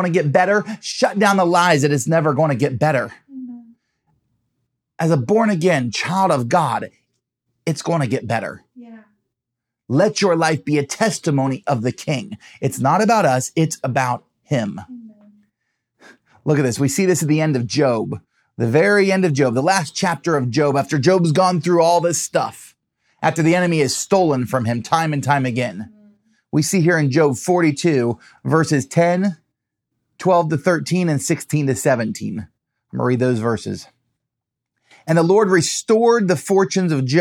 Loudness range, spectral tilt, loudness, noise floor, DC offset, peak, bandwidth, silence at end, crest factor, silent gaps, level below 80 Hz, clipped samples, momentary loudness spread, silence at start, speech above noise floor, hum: 5 LU; -5.5 dB/octave; -18 LUFS; -82 dBFS; under 0.1%; -2 dBFS; 16.5 kHz; 0 s; 18 dB; none; -66 dBFS; under 0.1%; 11 LU; 0 s; 65 dB; none